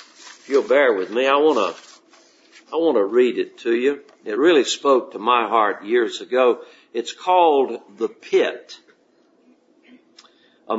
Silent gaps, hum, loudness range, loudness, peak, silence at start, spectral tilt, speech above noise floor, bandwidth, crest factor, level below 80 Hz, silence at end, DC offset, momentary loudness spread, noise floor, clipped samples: none; none; 3 LU; -19 LUFS; -2 dBFS; 0.25 s; -3 dB/octave; 40 dB; 8 kHz; 18 dB; -82 dBFS; 0 s; under 0.1%; 12 LU; -59 dBFS; under 0.1%